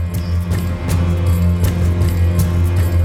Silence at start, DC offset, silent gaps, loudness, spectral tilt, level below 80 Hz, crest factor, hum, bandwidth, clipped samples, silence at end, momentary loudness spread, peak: 0 s; under 0.1%; none; -17 LUFS; -7 dB/octave; -26 dBFS; 10 dB; none; 16 kHz; under 0.1%; 0 s; 4 LU; -4 dBFS